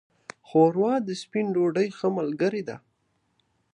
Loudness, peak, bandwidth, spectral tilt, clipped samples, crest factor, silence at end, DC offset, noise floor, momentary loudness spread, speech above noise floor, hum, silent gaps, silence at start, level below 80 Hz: -25 LUFS; -8 dBFS; 10.5 kHz; -7 dB/octave; under 0.1%; 18 dB; 0.95 s; under 0.1%; -72 dBFS; 19 LU; 48 dB; none; none; 0.5 s; -76 dBFS